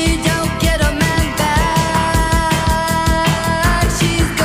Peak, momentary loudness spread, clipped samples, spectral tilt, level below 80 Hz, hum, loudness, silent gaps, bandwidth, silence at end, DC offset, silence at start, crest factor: -4 dBFS; 1 LU; under 0.1%; -4.5 dB/octave; -22 dBFS; none; -15 LUFS; none; 16 kHz; 0 s; under 0.1%; 0 s; 10 dB